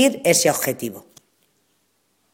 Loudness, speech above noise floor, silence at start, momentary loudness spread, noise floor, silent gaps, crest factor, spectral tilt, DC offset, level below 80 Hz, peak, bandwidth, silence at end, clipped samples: -19 LUFS; 48 dB; 0 s; 17 LU; -67 dBFS; none; 20 dB; -3 dB/octave; under 0.1%; -66 dBFS; -2 dBFS; 17 kHz; 1.35 s; under 0.1%